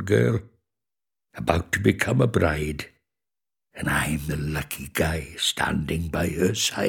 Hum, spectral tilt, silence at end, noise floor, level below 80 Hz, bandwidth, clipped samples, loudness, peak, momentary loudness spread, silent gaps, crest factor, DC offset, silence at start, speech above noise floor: none; -4.5 dB/octave; 0 s; under -90 dBFS; -42 dBFS; 19 kHz; under 0.1%; -24 LUFS; -2 dBFS; 9 LU; none; 24 dB; under 0.1%; 0 s; over 66 dB